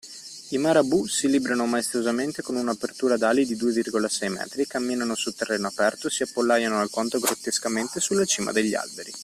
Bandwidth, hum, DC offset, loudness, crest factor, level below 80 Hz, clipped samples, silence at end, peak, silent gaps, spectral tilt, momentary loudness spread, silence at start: 15 kHz; none; under 0.1%; -24 LUFS; 18 dB; -66 dBFS; under 0.1%; 0 s; -6 dBFS; none; -3 dB/octave; 7 LU; 0.05 s